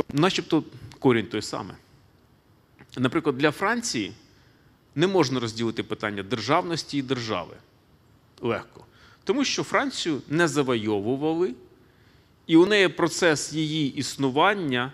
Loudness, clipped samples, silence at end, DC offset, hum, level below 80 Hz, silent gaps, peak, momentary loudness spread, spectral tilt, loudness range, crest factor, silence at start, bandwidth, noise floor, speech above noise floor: -25 LUFS; under 0.1%; 0 s; under 0.1%; none; -62 dBFS; none; -4 dBFS; 11 LU; -4.5 dB/octave; 6 LU; 20 dB; 0 s; 14.5 kHz; -59 dBFS; 35 dB